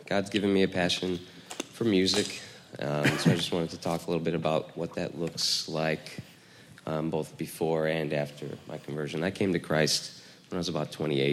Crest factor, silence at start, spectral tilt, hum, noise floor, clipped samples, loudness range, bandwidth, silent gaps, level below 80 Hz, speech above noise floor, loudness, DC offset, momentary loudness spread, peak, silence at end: 20 dB; 0 s; -4.5 dB/octave; none; -53 dBFS; under 0.1%; 4 LU; 15.5 kHz; none; -66 dBFS; 24 dB; -29 LUFS; under 0.1%; 14 LU; -10 dBFS; 0 s